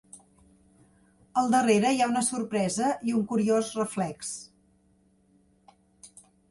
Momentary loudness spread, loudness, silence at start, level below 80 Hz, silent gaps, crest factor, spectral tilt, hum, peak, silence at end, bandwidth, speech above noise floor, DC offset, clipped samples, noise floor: 10 LU; -26 LUFS; 0.15 s; -68 dBFS; none; 18 dB; -4.5 dB/octave; none; -10 dBFS; 0.45 s; 11.5 kHz; 39 dB; under 0.1%; under 0.1%; -65 dBFS